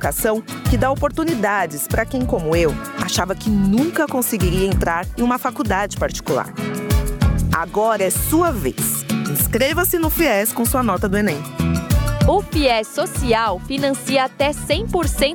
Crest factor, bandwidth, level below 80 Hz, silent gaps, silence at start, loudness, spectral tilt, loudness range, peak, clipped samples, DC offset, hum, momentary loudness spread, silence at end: 14 dB; over 20 kHz; -28 dBFS; none; 0 s; -19 LUFS; -5 dB/octave; 2 LU; -4 dBFS; under 0.1%; under 0.1%; none; 4 LU; 0 s